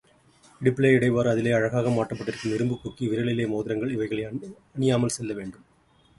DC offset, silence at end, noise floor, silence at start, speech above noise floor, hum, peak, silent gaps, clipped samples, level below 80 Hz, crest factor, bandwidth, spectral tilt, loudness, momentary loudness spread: under 0.1%; 0.65 s; -60 dBFS; 0.6 s; 36 dB; none; -6 dBFS; none; under 0.1%; -58 dBFS; 20 dB; 11.5 kHz; -6.5 dB/octave; -25 LUFS; 13 LU